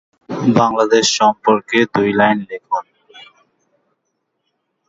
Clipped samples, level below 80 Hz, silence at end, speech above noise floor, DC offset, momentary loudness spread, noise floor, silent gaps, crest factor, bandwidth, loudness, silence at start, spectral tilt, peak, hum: under 0.1%; -58 dBFS; 1.65 s; 57 dB; under 0.1%; 10 LU; -72 dBFS; none; 18 dB; 8 kHz; -15 LUFS; 0.3 s; -4 dB/octave; 0 dBFS; none